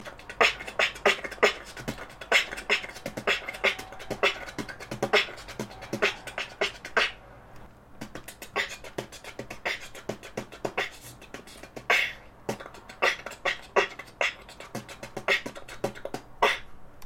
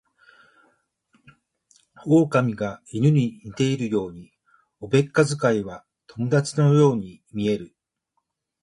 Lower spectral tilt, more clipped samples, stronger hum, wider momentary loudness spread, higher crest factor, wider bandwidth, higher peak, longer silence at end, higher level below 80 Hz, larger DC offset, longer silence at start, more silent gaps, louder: second, -2.5 dB/octave vs -7 dB/octave; neither; neither; about the same, 17 LU vs 17 LU; first, 26 dB vs 20 dB; first, 16 kHz vs 11.5 kHz; about the same, -6 dBFS vs -4 dBFS; second, 0 s vs 0.95 s; about the same, -56 dBFS vs -60 dBFS; neither; second, 0 s vs 2.05 s; neither; second, -28 LUFS vs -22 LUFS